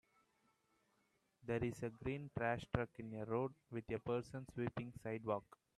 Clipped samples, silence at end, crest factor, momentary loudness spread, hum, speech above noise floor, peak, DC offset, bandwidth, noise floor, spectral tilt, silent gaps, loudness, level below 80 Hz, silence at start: under 0.1%; 0.35 s; 24 dB; 6 LU; none; 37 dB; -20 dBFS; under 0.1%; 13 kHz; -81 dBFS; -7.5 dB/octave; none; -44 LUFS; -68 dBFS; 1.45 s